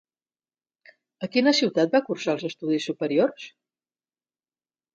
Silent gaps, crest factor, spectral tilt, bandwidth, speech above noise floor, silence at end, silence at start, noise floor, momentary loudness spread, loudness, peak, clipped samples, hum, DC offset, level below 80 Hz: none; 20 dB; -4.5 dB/octave; 8 kHz; over 66 dB; 1.45 s; 1.2 s; under -90 dBFS; 12 LU; -24 LUFS; -8 dBFS; under 0.1%; none; under 0.1%; -76 dBFS